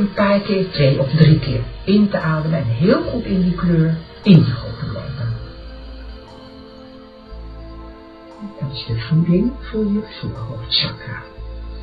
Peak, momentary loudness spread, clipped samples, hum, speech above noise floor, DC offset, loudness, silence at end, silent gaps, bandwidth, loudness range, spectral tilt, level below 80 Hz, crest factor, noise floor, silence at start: 0 dBFS; 24 LU; under 0.1%; none; 23 dB; under 0.1%; -18 LUFS; 0 s; none; 5 kHz; 16 LU; -9.5 dB/octave; -36 dBFS; 18 dB; -39 dBFS; 0 s